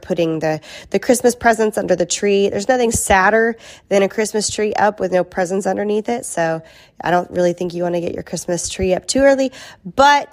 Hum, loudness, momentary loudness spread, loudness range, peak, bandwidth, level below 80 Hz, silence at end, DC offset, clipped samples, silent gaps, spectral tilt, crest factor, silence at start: none; -17 LUFS; 9 LU; 4 LU; 0 dBFS; 15.5 kHz; -42 dBFS; 0.05 s; under 0.1%; under 0.1%; none; -4 dB/octave; 16 dB; 0.05 s